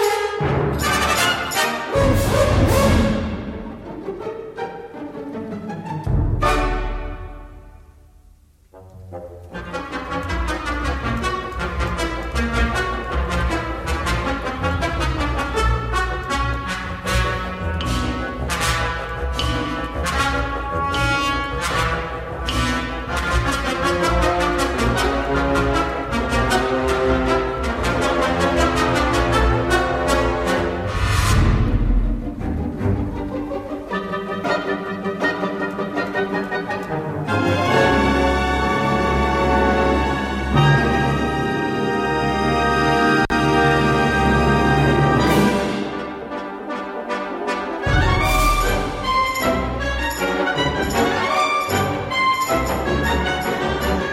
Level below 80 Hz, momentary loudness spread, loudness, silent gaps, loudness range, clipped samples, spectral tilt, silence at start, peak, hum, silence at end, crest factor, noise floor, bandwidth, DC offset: -28 dBFS; 11 LU; -20 LUFS; none; 7 LU; under 0.1%; -5 dB/octave; 0 s; -4 dBFS; none; 0 s; 16 dB; -50 dBFS; 16 kHz; under 0.1%